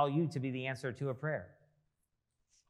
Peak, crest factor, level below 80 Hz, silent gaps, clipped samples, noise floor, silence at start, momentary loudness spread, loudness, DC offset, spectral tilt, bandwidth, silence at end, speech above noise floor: -18 dBFS; 20 dB; -82 dBFS; none; under 0.1%; -84 dBFS; 0 s; 7 LU; -38 LUFS; under 0.1%; -7.5 dB/octave; 12 kHz; 1.2 s; 47 dB